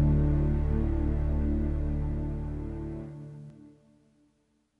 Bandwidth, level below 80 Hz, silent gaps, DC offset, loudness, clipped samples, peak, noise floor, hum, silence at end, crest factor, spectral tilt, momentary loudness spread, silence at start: 3.4 kHz; -32 dBFS; none; under 0.1%; -31 LUFS; under 0.1%; -14 dBFS; -72 dBFS; none; 1.1 s; 14 dB; -11 dB/octave; 17 LU; 0 s